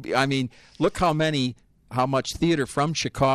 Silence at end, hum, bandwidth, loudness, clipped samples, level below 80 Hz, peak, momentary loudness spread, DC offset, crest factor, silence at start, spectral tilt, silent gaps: 0 s; none; 14 kHz; -24 LUFS; under 0.1%; -48 dBFS; -6 dBFS; 6 LU; under 0.1%; 18 dB; 0 s; -5 dB/octave; none